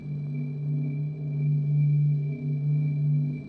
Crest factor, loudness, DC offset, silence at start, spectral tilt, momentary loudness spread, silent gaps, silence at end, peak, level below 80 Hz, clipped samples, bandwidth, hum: 8 dB; -27 LUFS; under 0.1%; 0 s; -12 dB/octave; 8 LU; none; 0 s; -18 dBFS; -62 dBFS; under 0.1%; 2.5 kHz; none